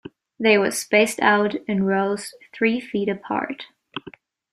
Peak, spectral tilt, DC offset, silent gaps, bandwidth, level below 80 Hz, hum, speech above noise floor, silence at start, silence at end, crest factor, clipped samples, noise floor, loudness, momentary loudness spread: -4 dBFS; -4.5 dB/octave; under 0.1%; none; 14.5 kHz; -66 dBFS; none; 25 dB; 0.05 s; 0.45 s; 20 dB; under 0.1%; -46 dBFS; -21 LUFS; 18 LU